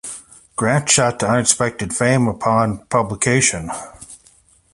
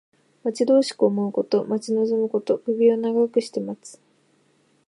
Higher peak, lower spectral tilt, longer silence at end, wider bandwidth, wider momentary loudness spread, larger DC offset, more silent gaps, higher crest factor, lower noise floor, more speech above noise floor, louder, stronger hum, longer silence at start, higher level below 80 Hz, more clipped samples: first, 0 dBFS vs -6 dBFS; second, -3.5 dB/octave vs -6 dB/octave; second, 0.6 s vs 0.95 s; about the same, 11.5 kHz vs 11.5 kHz; first, 15 LU vs 11 LU; neither; neither; about the same, 18 dB vs 16 dB; second, -53 dBFS vs -63 dBFS; second, 36 dB vs 41 dB; first, -17 LUFS vs -22 LUFS; neither; second, 0.05 s vs 0.45 s; first, -46 dBFS vs -80 dBFS; neither